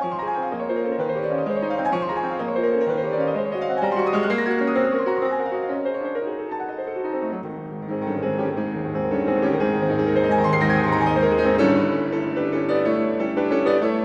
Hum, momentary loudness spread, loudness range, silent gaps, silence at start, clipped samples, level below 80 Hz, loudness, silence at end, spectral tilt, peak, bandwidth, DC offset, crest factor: none; 9 LU; 7 LU; none; 0 s; under 0.1%; -50 dBFS; -22 LUFS; 0 s; -8 dB/octave; -6 dBFS; 7.4 kHz; under 0.1%; 16 dB